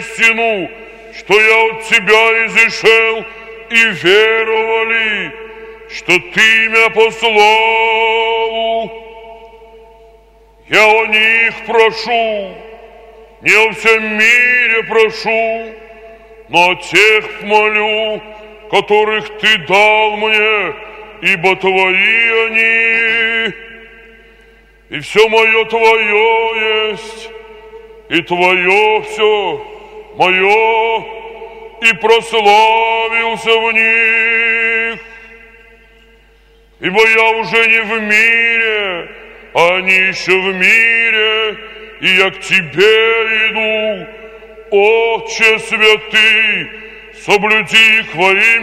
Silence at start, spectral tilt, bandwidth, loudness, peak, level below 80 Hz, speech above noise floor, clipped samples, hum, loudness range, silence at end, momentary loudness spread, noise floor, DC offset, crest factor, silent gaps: 0 s; -2.5 dB/octave; 15.5 kHz; -10 LUFS; 0 dBFS; -48 dBFS; 35 dB; 0.2%; none; 3 LU; 0 s; 14 LU; -46 dBFS; under 0.1%; 12 dB; none